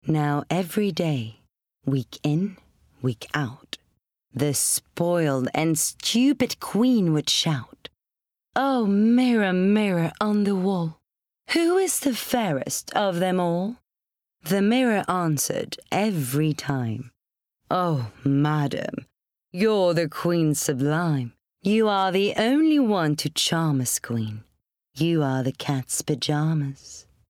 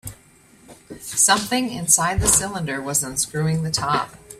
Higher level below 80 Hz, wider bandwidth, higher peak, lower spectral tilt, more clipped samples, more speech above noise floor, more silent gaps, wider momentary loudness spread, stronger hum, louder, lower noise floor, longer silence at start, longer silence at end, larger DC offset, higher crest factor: second, -64 dBFS vs -40 dBFS; first, 18.5 kHz vs 16 kHz; second, -8 dBFS vs -2 dBFS; first, -5 dB/octave vs -2.5 dB/octave; neither; first, 64 dB vs 31 dB; neither; about the same, 10 LU vs 11 LU; neither; second, -23 LUFS vs -19 LUFS; first, -87 dBFS vs -52 dBFS; about the same, 0.05 s vs 0.05 s; first, 0.3 s vs 0.05 s; neither; second, 14 dB vs 22 dB